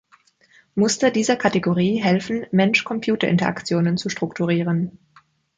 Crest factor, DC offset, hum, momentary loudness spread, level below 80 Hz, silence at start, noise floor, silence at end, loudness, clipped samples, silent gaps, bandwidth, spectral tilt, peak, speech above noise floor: 18 dB; under 0.1%; none; 6 LU; -60 dBFS; 0.75 s; -57 dBFS; 0.65 s; -20 LUFS; under 0.1%; none; 9.4 kHz; -5.5 dB/octave; -4 dBFS; 37 dB